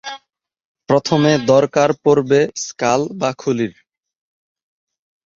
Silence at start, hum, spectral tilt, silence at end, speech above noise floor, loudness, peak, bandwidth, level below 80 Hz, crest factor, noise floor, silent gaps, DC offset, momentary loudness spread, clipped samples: 0.05 s; none; -5.5 dB/octave; 1.7 s; 57 dB; -16 LUFS; 0 dBFS; 7.6 kHz; -58 dBFS; 18 dB; -72 dBFS; 0.65-0.75 s; under 0.1%; 8 LU; under 0.1%